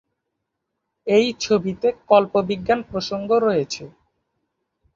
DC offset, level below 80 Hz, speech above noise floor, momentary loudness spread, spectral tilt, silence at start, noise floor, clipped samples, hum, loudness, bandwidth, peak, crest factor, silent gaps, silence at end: under 0.1%; -56 dBFS; 59 dB; 10 LU; -5 dB/octave; 1.05 s; -79 dBFS; under 0.1%; none; -20 LUFS; 7.6 kHz; -2 dBFS; 20 dB; none; 1.05 s